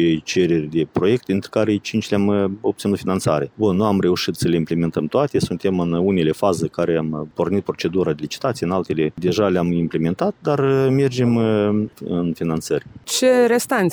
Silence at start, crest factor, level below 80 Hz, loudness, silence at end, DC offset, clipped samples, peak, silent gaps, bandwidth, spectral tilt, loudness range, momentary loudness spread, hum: 0 s; 14 dB; -54 dBFS; -20 LUFS; 0 s; under 0.1%; under 0.1%; -4 dBFS; none; over 20 kHz; -6 dB/octave; 2 LU; 6 LU; none